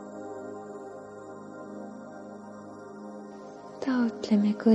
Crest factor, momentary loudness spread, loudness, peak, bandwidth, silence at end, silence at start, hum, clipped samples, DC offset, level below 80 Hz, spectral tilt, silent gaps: 20 dB; 18 LU; -32 LUFS; -10 dBFS; 8.2 kHz; 0 s; 0 s; none; under 0.1%; under 0.1%; -74 dBFS; -7.5 dB/octave; none